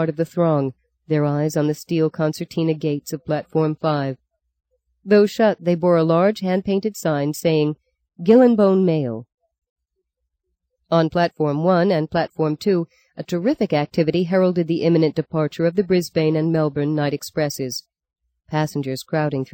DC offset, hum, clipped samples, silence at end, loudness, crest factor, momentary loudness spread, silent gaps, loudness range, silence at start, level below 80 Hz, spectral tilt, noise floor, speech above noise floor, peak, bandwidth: under 0.1%; none; under 0.1%; 0.1 s; -20 LUFS; 16 dB; 9 LU; 9.34-9.38 s, 9.69-9.76 s; 4 LU; 0 s; -60 dBFS; -7 dB/octave; -77 dBFS; 58 dB; -4 dBFS; 17 kHz